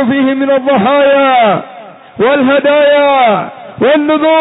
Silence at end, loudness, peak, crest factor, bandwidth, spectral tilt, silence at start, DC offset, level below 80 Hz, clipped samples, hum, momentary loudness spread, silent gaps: 0 s; -9 LUFS; -2 dBFS; 8 dB; 4 kHz; -9 dB/octave; 0 s; under 0.1%; -54 dBFS; under 0.1%; none; 7 LU; none